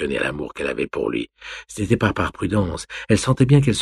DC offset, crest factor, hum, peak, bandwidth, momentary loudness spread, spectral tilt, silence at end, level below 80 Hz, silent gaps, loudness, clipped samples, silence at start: under 0.1%; 18 dB; none; -2 dBFS; 12 kHz; 14 LU; -6 dB/octave; 0 s; -42 dBFS; none; -21 LUFS; under 0.1%; 0 s